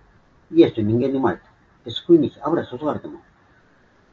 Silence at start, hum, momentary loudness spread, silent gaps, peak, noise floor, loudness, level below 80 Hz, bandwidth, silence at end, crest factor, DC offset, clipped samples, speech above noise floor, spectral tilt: 0.5 s; none; 15 LU; none; -2 dBFS; -56 dBFS; -20 LUFS; -56 dBFS; 4.4 kHz; 0.95 s; 20 dB; under 0.1%; under 0.1%; 37 dB; -8.5 dB/octave